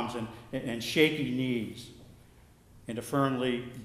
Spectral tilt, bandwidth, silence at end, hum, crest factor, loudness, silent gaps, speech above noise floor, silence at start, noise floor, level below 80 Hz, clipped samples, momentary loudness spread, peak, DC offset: -5.5 dB/octave; 15.5 kHz; 0 s; none; 22 dB; -31 LUFS; none; 27 dB; 0 s; -57 dBFS; -60 dBFS; under 0.1%; 16 LU; -10 dBFS; under 0.1%